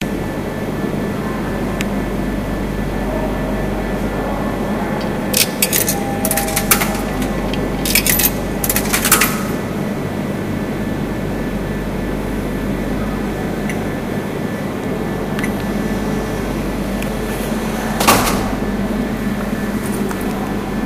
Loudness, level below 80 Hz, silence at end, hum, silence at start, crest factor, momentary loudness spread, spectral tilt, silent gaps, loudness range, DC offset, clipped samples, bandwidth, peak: -18 LUFS; -30 dBFS; 0 s; 50 Hz at -30 dBFS; 0 s; 18 dB; 8 LU; -4 dB/octave; none; 6 LU; under 0.1%; under 0.1%; 16 kHz; 0 dBFS